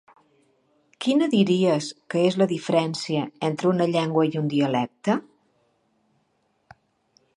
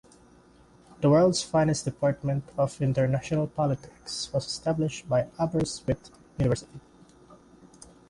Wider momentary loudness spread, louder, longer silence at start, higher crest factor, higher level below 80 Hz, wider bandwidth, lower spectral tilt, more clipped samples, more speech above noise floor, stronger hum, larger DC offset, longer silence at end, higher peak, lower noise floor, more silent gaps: about the same, 7 LU vs 9 LU; first, -23 LUFS vs -27 LUFS; about the same, 1 s vs 1 s; about the same, 18 dB vs 18 dB; second, -72 dBFS vs -52 dBFS; about the same, 11 kHz vs 11.5 kHz; about the same, -6 dB/octave vs -6 dB/octave; neither; first, 47 dB vs 30 dB; neither; neither; first, 2.15 s vs 0.75 s; first, -6 dBFS vs -10 dBFS; first, -69 dBFS vs -56 dBFS; neither